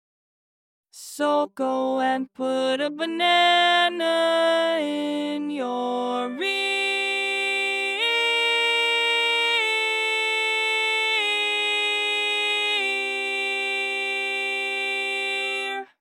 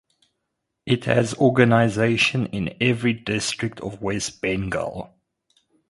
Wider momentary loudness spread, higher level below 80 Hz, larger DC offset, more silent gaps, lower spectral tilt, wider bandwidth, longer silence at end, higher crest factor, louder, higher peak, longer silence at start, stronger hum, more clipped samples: second, 7 LU vs 12 LU; second, under -90 dBFS vs -50 dBFS; neither; neither; second, -1 dB/octave vs -5 dB/octave; first, 16.5 kHz vs 11.5 kHz; second, 0.2 s vs 0.85 s; second, 16 dB vs 22 dB; about the same, -22 LUFS vs -22 LUFS; second, -8 dBFS vs 0 dBFS; about the same, 0.95 s vs 0.85 s; neither; neither